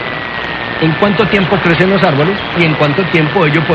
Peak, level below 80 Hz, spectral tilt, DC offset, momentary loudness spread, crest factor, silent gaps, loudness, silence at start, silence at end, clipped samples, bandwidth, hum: 0 dBFS; -38 dBFS; -7.5 dB/octave; under 0.1%; 8 LU; 12 dB; none; -11 LUFS; 0 s; 0 s; under 0.1%; 7.6 kHz; none